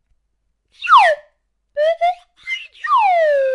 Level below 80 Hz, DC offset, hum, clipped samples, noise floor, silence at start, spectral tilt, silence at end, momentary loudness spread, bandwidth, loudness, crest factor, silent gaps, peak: -62 dBFS; under 0.1%; none; under 0.1%; -68 dBFS; 0.8 s; 1 dB/octave; 0 s; 16 LU; 11.5 kHz; -15 LUFS; 16 dB; none; -2 dBFS